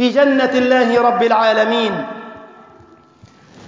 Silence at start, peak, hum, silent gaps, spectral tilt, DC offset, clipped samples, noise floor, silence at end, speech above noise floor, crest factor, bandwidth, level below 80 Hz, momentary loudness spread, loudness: 0 s; -2 dBFS; none; none; -5 dB/octave; under 0.1%; under 0.1%; -46 dBFS; 0 s; 32 dB; 14 dB; 7.6 kHz; -58 dBFS; 15 LU; -14 LUFS